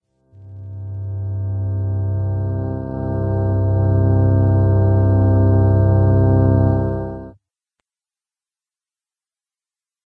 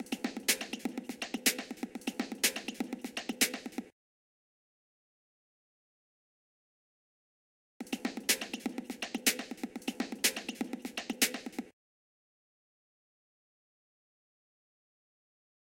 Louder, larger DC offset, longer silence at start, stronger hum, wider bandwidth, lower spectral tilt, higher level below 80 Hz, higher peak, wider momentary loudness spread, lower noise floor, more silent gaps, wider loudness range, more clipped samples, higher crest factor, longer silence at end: first, -17 LUFS vs -34 LUFS; neither; first, 0.4 s vs 0 s; neither; second, 1.7 kHz vs 17 kHz; first, -13 dB/octave vs -1 dB/octave; first, -34 dBFS vs -80 dBFS; first, -4 dBFS vs -12 dBFS; about the same, 13 LU vs 11 LU; about the same, under -90 dBFS vs under -90 dBFS; second, none vs 3.92-7.80 s; first, 9 LU vs 6 LU; neither; second, 14 dB vs 28 dB; second, 2.75 s vs 3.9 s